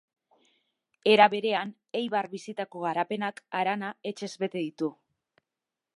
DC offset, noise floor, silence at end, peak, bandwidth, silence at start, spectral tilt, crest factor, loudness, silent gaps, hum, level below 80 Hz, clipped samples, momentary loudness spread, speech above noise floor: under 0.1%; -89 dBFS; 1.05 s; -4 dBFS; 11.5 kHz; 1.05 s; -5 dB/octave; 26 dB; -28 LUFS; none; none; -84 dBFS; under 0.1%; 16 LU; 61 dB